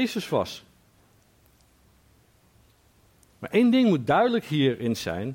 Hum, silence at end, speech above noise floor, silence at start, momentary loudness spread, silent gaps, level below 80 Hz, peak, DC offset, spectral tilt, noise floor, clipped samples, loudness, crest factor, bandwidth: none; 0 s; 37 dB; 0 s; 12 LU; none; -62 dBFS; -10 dBFS; under 0.1%; -6 dB/octave; -60 dBFS; under 0.1%; -24 LUFS; 16 dB; 16.5 kHz